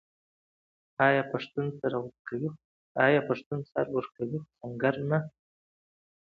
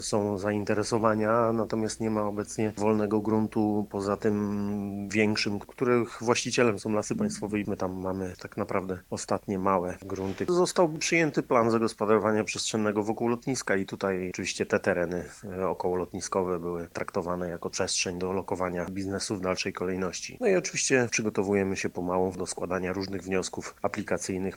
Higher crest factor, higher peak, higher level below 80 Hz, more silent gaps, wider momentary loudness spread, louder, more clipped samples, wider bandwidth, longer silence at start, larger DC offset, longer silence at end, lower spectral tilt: about the same, 22 dB vs 22 dB; about the same, -8 dBFS vs -6 dBFS; second, -70 dBFS vs -58 dBFS; first, 2.19-2.25 s, 2.65-2.95 s, 3.46-3.51 s vs none; first, 13 LU vs 8 LU; about the same, -30 LUFS vs -28 LUFS; neither; second, 6.6 kHz vs 18.5 kHz; first, 1 s vs 0 s; neither; first, 0.95 s vs 0 s; first, -8.5 dB/octave vs -4.5 dB/octave